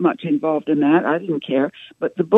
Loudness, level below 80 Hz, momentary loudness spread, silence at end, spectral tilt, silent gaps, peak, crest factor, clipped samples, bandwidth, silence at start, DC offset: -20 LUFS; -70 dBFS; 9 LU; 0 s; -9 dB/octave; none; 0 dBFS; 18 dB; under 0.1%; 4 kHz; 0 s; under 0.1%